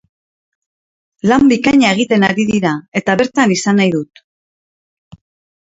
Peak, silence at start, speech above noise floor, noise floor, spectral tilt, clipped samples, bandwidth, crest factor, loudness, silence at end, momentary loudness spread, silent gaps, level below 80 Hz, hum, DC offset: 0 dBFS; 1.25 s; over 77 dB; under -90 dBFS; -5 dB/octave; under 0.1%; 8 kHz; 16 dB; -13 LUFS; 1.55 s; 8 LU; 2.88-2.92 s; -50 dBFS; none; under 0.1%